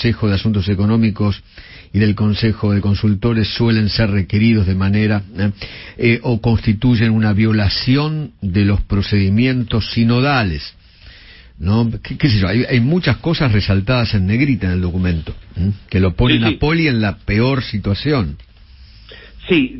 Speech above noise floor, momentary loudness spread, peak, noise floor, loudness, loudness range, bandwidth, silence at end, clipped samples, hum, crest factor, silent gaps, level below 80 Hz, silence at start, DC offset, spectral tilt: 26 dB; 7 LU; -2 dBFS; -41 dBFS; -16 LUFS; 2 LU; 5.8 kHz; 0 s; under 0.1%; none; 14 dB; none; -32 dBFS; 0 s; under 0.1%; -10.5 dB/octave